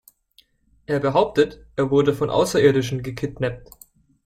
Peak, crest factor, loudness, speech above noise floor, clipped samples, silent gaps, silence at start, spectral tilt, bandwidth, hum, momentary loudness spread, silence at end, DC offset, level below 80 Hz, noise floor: -4 dBFS; 18 dB; -21 LUFS; 39 dB; under 0.1%; none; 0.9 s; -6 dB/octave; 15.5 kHz; none; 10 LU; 0.65 s; under 0.1%; -50 dBFS; -59 dBFS